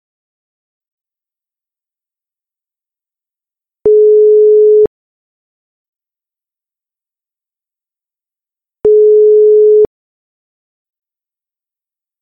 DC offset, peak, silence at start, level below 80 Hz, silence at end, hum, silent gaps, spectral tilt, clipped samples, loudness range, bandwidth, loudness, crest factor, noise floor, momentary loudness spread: under 0.1%; -2 dBFS; 3.85 s; -54 dBFS; 2.35 s; none; 4.87-5.93 s; -11 dB/octave; under 0.1%; 6 LU; 1.2 kHz; -8 LUFS; 12 dB; -89 dBFS; 9 LU